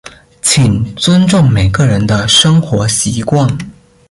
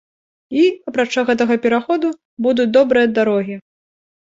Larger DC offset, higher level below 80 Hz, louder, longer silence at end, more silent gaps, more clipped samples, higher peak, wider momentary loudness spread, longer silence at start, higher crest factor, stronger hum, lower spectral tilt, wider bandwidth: neither; first, -32 dBFS vs -60 dBFS; first, -10 LUFS vs -16 LUFS; second, 0.4 s vs 0.65 s; second, none vs 2.25-2.37 s; neither; about the same, 0 dBFS vs -2 dBFS; about the same, 7 LU vs 9 LU; second, 0.05 s vs 0.5 s; second, 10 dB vs 16 dB; neither; about the same, -4.5 dB/octave vs -5.5 dB/octave; first, 11.5 kHz vs 7.8 kHz